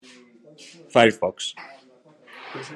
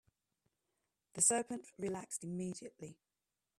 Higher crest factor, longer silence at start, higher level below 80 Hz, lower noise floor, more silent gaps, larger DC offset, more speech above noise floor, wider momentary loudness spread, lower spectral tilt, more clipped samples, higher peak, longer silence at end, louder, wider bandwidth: about the same, 26 dB vs 26 dB; second, 0.95 s vs 1.15 s; first, -70 dBFS vs -80 dBFS; second, -54 dBFS vs under -90 dBFS; neither; neither; second, 32 dB vs over 51 dB; first, 26 LU vs 22 LU; about the same, -4 dB/octave vs -3.5 dB/octave; neither; first, 0 dBFS vs -16 dBFS; second, 0 s vs 0.65 s; first, -21 LUFS vs -37 LUFS; second, 11.5 kHz vs 14.5 kHz